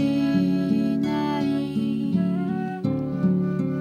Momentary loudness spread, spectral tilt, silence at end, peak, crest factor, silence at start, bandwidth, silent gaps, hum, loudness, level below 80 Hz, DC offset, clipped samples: 5 LU; -8.5 dB/octave; 0 s; -10 dBFS; 12 dB; 0 s; 9.2 kHz; none; none; -24 LUFS; -54 dBFS; under 0.1%; under 0.1%